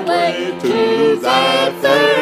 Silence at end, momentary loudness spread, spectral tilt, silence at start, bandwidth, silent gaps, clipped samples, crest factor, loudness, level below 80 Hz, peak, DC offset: 0 s; 5 LU; -4 dB/octave; 0 s; 15.5 kHz; none; under 0.1%; 14 dB; -14 LUFS; -66 dBFS; 0 dBFS; under 0.1%